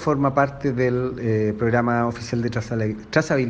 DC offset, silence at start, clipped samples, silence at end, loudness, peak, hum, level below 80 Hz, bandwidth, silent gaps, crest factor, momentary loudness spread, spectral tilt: under 0.1%; 0 s; under 0.1%; 0 s; -22 LUFS; -4 dBFS; none; -48 dBFS; 8.6 kHz; none; 18 dB; 5 LU; -7 dB/octave